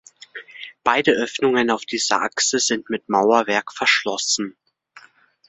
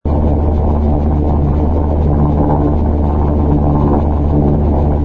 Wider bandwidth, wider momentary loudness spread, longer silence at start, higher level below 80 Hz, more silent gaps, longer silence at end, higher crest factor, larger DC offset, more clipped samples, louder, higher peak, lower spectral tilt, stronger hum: first, 8.4 kHz vs 3 kHz; first, 17 LU vs 2 LU; first, 0.35 s vs 0.05 s; second, -66 dBFS vs -16 dBFS; neither; first, 0.5 s vs 0 s; first, 20 dB vs 12 dB; neither; neither; second, -19 LUFS vs -14 LUFS; about the same, -2 dBFS vs 0 dBFS; second, -2 dB/octave vs -12 dB/octave; neither